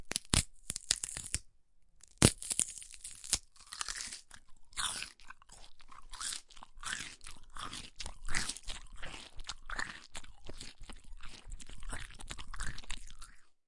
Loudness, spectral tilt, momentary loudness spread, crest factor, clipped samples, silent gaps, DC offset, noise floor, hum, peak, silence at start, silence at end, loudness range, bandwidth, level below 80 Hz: -37 LUFS; -2.5 dB/octave; 22 LU; 36 dB; under 0.1%; none; under 0.1%; -62 dBFS; none; -4 dBFS; 0 s; 0.15 s; 12 LU; 11.5 kHz; -48 dBFS